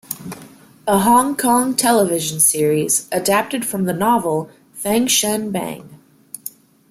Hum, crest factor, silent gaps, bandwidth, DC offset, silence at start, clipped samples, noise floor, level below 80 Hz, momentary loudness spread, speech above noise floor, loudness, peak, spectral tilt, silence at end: none; 18 dB; none; 16.5 kHz; under 0.1%; 0.1 s; under 0.1%; -43 dBFS; -58 dBFS; 18 LU; 26 dB; -16 LUFS; 0 dBFS; -3.5 dB/octave; 0.4 s